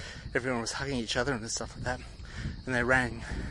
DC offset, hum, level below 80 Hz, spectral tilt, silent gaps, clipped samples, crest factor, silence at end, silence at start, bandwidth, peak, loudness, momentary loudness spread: under 0.1%; none; -44 dBFS; -4 dB/octave; none; under 0.1%; 22 dB; 0 s; 0 s; 11.5 kHz; -10 dBFS; -32 LUFS; 13 LU